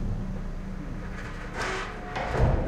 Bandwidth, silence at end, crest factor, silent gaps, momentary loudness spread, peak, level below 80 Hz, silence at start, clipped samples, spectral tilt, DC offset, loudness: 10.5 kHz; 0 s; 18 dB; none; 11 LU; -10 dBFS; -34 dBFS; 0 s; under 0.1%; -6 dB/octave; under 0.1%; -33 LUFS